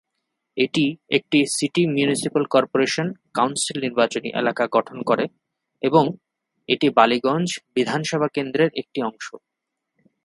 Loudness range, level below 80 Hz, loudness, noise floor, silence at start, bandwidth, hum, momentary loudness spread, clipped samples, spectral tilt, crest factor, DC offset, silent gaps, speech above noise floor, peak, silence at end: 2 LU; -68 dBFS; -21 LUFS; -80 dBFS; 0.55 s; 11.5 kHz; none; 8 LU; under 0.1%; -4.5 dB/octave; 22 dB; under 0.1%; none; 59 dB; 0 dBFS; 0.9 s